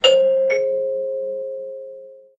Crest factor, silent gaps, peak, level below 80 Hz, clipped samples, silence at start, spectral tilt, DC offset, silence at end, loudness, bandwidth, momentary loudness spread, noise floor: 18 dB; none; -2 dBFS; -68 dBFS; under 0.1%; 0.05 s; -1 dB/octave; under 0.1%; 0.2 s; -20 LUFS; 7.8 kHz; 19 LU; -40 dBFS